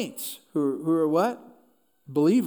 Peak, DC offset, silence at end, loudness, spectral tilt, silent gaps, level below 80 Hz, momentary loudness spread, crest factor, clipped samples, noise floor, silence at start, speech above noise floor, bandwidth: -10 dBFS; under 0.1%; 0 s; -26 LUFS; -6 dB/octave; none; -82 dBFS; 11 LU; 16 dB; under 0.1%; -64 dBFS; 0 s; 39 dB; over 20 kHz